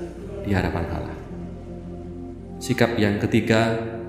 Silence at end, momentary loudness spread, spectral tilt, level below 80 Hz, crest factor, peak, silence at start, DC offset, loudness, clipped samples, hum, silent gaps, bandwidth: 0 s; 16 LU; -6.5 dB/octave; -40 dBFS; 24 dB; -2 dBFS; 0 s; under 0.1%; -23 LUFS; under 0.1%; none; none; 16 kHz